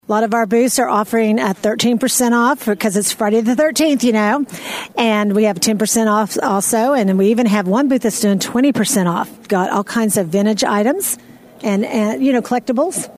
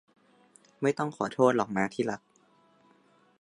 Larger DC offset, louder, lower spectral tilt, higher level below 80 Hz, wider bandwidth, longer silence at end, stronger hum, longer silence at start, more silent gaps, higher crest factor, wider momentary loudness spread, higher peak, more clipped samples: neither; first, -15 LUFS vs -29 LUFS; second, -4 dB/octave vs -6 dB/octave; first, -58 dBFS vs -72 dBFS; first, 16 kHz vs 11.5 kHz; second, 0.05 s vs 1.25 s; neither; second, 0.1 s vs 0.8 s; neither; second, 16 dB vs 22 dB; second, 5 LU vs 9 LU; first, 0 dBFS vs -10 dBFS; neither